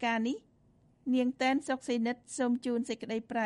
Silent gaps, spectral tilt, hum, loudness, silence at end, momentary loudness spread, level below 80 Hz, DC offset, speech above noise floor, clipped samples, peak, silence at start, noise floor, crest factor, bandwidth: none; -4 dB/octave; none; -33 LUFS; 0 s; 7 LU; -74 dBFS; under 0.1%; 34 dB; under 0.1%; -16 dBFS; 0 s; -66 dBFS; 16 dB; 11.5 kHz